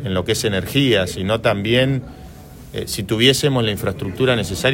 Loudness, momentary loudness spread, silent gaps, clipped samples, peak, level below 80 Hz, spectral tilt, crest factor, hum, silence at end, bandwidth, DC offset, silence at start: -18 LUFS; 11 LU; none; under 0.1%; 0 dBFS; -42 dBFS; -4.5 dB/octave; 18 dB; none; 0 s; 16.5 kHz; under 0.1%; 0 s